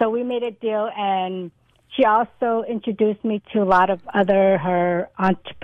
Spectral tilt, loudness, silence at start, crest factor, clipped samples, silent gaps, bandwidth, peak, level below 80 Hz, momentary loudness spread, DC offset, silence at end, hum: -8 dB/octave; -20 LUFS; 0 s; 14 dB; under 0.1%; none; 6.2 kHz; -6 dBFS; -56 dBFS; 8 LU; under 0.1%; 0 s; none